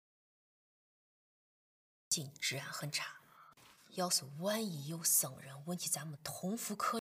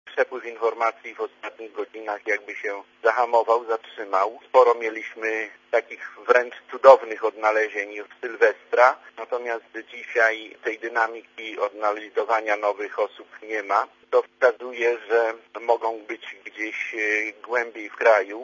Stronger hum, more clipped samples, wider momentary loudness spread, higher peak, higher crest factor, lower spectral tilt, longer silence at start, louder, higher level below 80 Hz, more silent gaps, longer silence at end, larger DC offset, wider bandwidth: neither; neither; about the same, 14 LU vs 14 LU; second, -18 dBFS vs 0 dBFS; about the same, 24 dB vs 24 dB; about the same, -2.5 dB/octave vs -2 dB/octave; first, 2.1 s vs 0.05 s; second, -37 LUFS vs -23 LUFS; second, -84 dBFS vs -78 dBFS; neither; about the same, 0 s vs 0 s; neither; first, 15.5 kHz vs 7.4 kHz